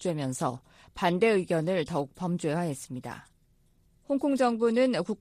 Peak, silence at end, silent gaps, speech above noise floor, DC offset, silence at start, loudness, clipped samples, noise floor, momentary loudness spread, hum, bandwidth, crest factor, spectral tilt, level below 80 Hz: -12 dBFS; 0.05 s; none; 37 dB; under 0.1%; 0 s; -28 LUFS; under 0.1%; -65 dBFS; 15 LU; none; 15 kHz; 18 dB; -6 dB/octave; -62 dBFS